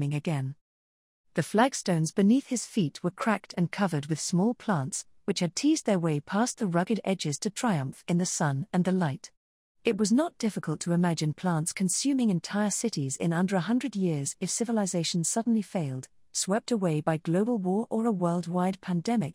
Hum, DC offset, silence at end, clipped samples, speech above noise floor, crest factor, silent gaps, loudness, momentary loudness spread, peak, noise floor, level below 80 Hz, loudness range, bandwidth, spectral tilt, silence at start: none; under 0.1%; 0 s; under 0.1%; over 62 dB; 20 dB; 0.61-1.24 s, 9.37-9.75 s; -28 LUFS; 6 LU; -8 dBFS; under -90 dBFS; -70 dBFS; 1 LU; 15.5 kHz; -5 dB/octave; 0 s